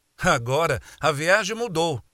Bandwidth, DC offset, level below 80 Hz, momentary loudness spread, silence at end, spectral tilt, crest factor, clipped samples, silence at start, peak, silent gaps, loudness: 16.5 kHz; under 0.1%; -48 dBFS; 5 LU; 0.15 s; -4 dB/octave; 20 dB; under 0.1%; 0.2 s; -4 dBFS; none; -23 LUFS